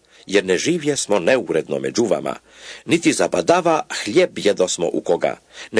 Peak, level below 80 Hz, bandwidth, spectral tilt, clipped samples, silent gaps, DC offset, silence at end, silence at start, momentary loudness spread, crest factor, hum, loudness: 0 dBFS; -60 dBFS; 11 kHz; -4 dB/octave; under 0.1%; none; under 0.1%; 0 s; 0.3 s; 7 LU; 18 dB; none; -19 LUFS